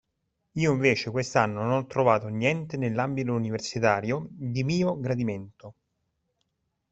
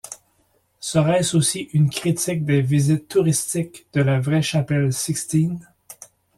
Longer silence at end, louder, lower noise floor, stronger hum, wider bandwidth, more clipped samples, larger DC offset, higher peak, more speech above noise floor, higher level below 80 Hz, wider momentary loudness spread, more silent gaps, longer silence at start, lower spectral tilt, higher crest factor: first, 1.2 s vs 0.3 s; second, -27 LUFS vs -20 LUFS; first, -78 dBFS vs -64 dBFS; neither; second, 8.2 kHz vs 14.5 kHz; neither; neither; about the same, -6 dBFS vs -4 dBFS; first, 52 dB vs 44 dB; second, -62 dBFS vs -56 dBFS; second, 8 LU vs 15 LU; neither; first, 0.55 s vs 0.05 s; about the same, -6 dB/octave vs -5.5 dB/octave; first, 22 dB vs 16 dB